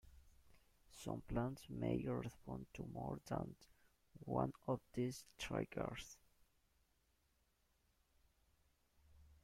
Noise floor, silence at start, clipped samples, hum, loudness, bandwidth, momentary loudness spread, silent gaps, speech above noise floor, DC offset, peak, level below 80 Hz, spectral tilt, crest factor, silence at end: -81 dBFS; 0.05 s; under 0.1%; none; -46 LUFS; 16 kHz; 12 LU; none; 35 dB; under 0.1%; -26 dBFS; -64 dBFS; -6.5 dB/octave; 24 dB; 0.1 s